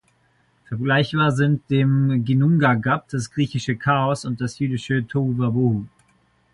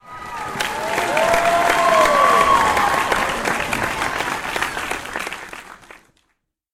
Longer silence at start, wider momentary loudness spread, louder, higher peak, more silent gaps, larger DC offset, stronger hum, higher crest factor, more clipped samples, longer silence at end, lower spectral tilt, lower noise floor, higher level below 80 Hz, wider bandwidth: first, 0.7 s vs 0.05 s; second, 9 LU vs 15 LU; second, -21 LUFS vs -18 LUFS; about the same, -4 dBFS vs -2 dBFS; neither; neither; neither; about the same, 16 dB vs 18 dB; neither; second, 0.65 s vs 1 s; first, -7 dB/octave vs -2.5 dB/octave; second, -62 dBFS vs -70 dBFS; second, -54 dBFS vs -44 dBFS; second, 11 kHz vs 16.5 kHz